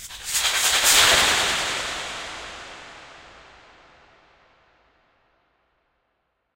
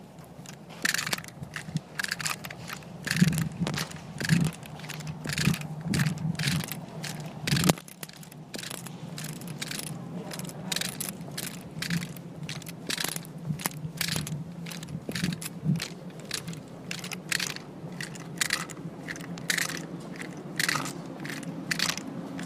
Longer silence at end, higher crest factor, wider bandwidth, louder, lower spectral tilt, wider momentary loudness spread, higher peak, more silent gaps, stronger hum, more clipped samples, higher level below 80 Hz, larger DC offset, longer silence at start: first, 3.35 s vs 0 s; second, 22 dB vs 30 dB; about the same, 16 kHz vs 15.5 kHz; first, -18 LUFS vs -32 LUFS; second, 1 dB/octave vs -3.5 dB/octave; first, 24 LU vs 12 LU; about the same, -4 dBFS vs -2 dBFS; neither; neither; neither; first, -50 dBFS vs -58 dBFS; neither; about the same, 0 s vs 0 s